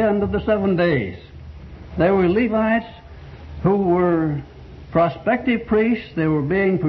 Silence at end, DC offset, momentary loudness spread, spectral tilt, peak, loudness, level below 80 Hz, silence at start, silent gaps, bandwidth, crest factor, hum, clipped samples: 0 s; under 0.1%; 22 LU; -10 dB/octave; -4 dBFS; -19 LUFS; -40 dBFS; 0 s; none; 6 kHz; 16 dB; none; under 0.1%